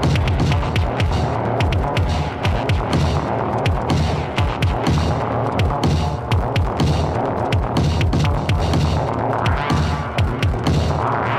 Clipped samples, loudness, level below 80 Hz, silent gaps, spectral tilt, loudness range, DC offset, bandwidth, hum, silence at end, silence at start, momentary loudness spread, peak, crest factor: under 0.1%; -19 LUFS; -26 dBFS; none; -6.5 dB/octave; 1 LU; under 0.1%; 12.5 kHz; none; 0 s; 0 s; 3 LU; -4 dBFS; 14 dB